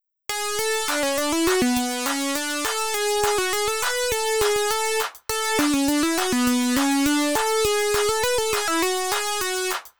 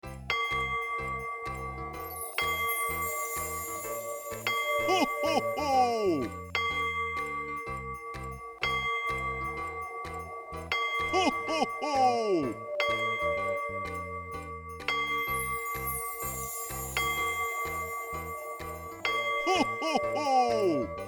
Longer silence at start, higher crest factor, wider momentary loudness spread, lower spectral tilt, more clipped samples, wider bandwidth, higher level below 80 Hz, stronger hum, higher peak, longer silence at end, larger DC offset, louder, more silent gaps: about the same, 0 s vs 0.05 s; about the same, 14 dB vs 18 dB; second, 4 LU vs 11 LU; second, -1.5 dB/octave vs -3 dB/octave; neither; about the same, over 20 kHz vs over 20 kHz; about the same, -48 dBFS vs -52 dBFS; neither; first, -8 dBFS vs -14 dBFS; about the same, 0 s vs 0 s; first, 0.8% vs under 0.1%; first, -22 LUFS vs -31 LUFS; neither